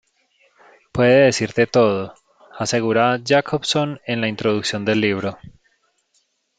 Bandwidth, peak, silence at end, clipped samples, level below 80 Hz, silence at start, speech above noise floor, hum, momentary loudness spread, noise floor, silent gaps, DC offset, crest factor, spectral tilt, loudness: 9.4 kHz; -2 dBFS; 1.1 s; under 0.1%; -56 dBFS; 0.95 s; 48 dB; none; 11 LU; -66 dBFS; none; under 0.1%; 18 dB; -5 dB/octave; -19 LUFS